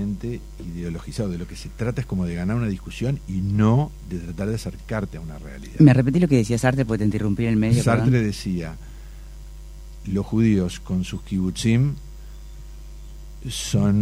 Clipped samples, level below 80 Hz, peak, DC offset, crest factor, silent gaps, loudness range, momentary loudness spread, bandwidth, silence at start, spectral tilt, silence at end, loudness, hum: under 0.1%; -38 dBFS; -2 dBFS; under 0.1%; 20 dB; none; 7 LU; 23 LU; 15.5 kHz; 0 s; -7 dB/octave; 0 s; -22 LUFS; none